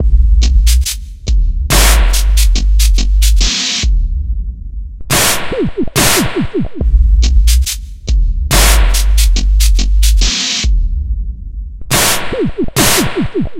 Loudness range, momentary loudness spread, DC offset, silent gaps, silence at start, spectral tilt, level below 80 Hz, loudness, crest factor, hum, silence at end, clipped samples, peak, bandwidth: 2 LU; 11 LU; under 0.1%; none; 0 s; -3.5 dB/octave; -12 dBFS; -13 LUFS; 10 dB; none; 0 s; under 0.1%; 0 dBFS; 16.5 kHz